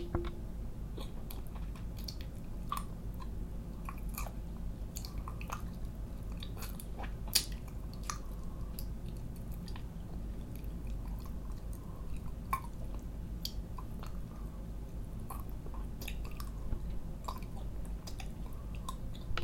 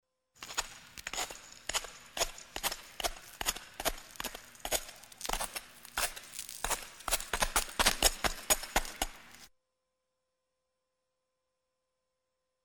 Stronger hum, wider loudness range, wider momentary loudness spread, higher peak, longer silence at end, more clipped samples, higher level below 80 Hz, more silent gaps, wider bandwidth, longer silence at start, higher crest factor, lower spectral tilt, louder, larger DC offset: neither; about the same, 5 LU vs 6 LU; second, 5 LU vs 14 LU; first, -4 dBFS vs -8 dBFS; second, 0 s vs 3.2 s; neither; first, -42 dBFS vs -48 dBFS; neither; about the same, 16.5 kHz vs 17.5 kHz; second, 0 s vs 0.4 s; first, 36 dB vs 30 dB; first, -4.5 dB/octave vs -0.5 dB/octave; second, -43 LUFS vs -34 LUFS; neither